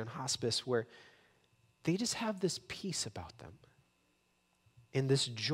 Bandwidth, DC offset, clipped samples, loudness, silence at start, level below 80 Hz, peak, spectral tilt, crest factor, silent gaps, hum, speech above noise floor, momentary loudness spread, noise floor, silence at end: 16 kHz; under 0.1%; under 0.1%; -36 LUFS; 0 s; -72 dBFS; -20 dBFS; -4 dB/octave; 18 dB; none; none; 39 dB; 17 LU; -76 dBFS; 0 s